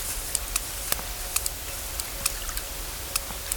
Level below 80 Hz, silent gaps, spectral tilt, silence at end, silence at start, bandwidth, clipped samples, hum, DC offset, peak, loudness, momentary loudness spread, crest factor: -38 dBFS; none; -1 dB/octave; 0 s; 0 s; 19.5 kHz; under 0.1%; none; under 0.1%; -4 dBFS; -29 LUFS; 5 LU; 28 dB